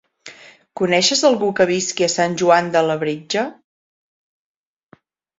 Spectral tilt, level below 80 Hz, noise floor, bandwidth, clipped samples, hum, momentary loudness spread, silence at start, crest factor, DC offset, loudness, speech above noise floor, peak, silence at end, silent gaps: -3.5 dB/octave; -64 dBFS; -53 dBFS; 8 kHz; under 0.1%; none; 8 LU; 0.25 s; 18 dB; under 0.1%; -17 LUFS; 36 dB; -2 dBFS; 1.85 s; none